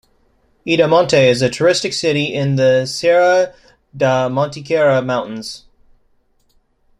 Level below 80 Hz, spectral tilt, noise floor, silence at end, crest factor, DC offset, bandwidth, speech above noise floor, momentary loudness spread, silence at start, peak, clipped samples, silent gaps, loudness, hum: -54 dBFS; -5 dB/octave; -58 dBFS; 1.4 s; 16 dB; under 0.1%; 11.5 kHz; 44 dB; 11 LU; 0.65 s; -2 dBFS; under 0.1%; none; -15 LUFS; none